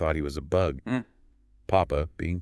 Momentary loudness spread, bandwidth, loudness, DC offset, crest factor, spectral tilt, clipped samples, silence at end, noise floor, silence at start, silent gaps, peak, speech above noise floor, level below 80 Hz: 7 LU; 12 kHz; -28 LUFS; under 0.1%; 20 dB; -7.5 dB/octave; under 0.1%; 0 s; -59 dBFS; 0 s; none; -8 dBFS; 32 dB; -42 dBFS